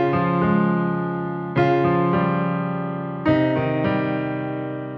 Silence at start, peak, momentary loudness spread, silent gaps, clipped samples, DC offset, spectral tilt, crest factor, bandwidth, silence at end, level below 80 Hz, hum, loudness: 0 s; -6 dBFS; 8 LU; none; under 0.1%; under 0.1%; -10 dB/octave; 14 dB; 5.8 kHz; 0 s; -54 dBFS; none; -21 LUFS